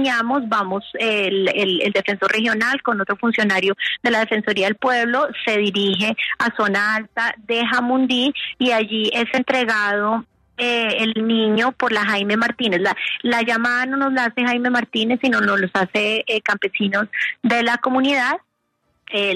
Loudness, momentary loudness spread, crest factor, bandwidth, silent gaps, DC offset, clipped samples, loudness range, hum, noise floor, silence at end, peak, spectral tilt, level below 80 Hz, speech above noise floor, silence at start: -19 LUFS; 4 LU; 14 dB; 13 kHz; none; under 0.1%; under 0.1%; 1 LU; none; -69 dBFS; 0 s; -6 dBFS; -4.5 dB/octave; -64 dBFS; 49 dB; 0 s